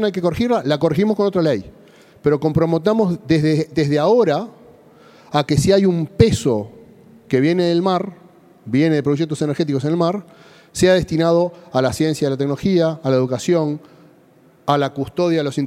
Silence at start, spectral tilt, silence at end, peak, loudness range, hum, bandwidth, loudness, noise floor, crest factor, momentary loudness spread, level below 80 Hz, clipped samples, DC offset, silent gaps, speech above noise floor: 0 s; -6.5 dB/octave; 0 s; 0 dBFS; 2 LU; none; 15 kHz; -18 LUFS; -51 dBFS; 18 dB; 7 LU; -46 dBFS; under 0.1%; under 0.1%; none; 34 dB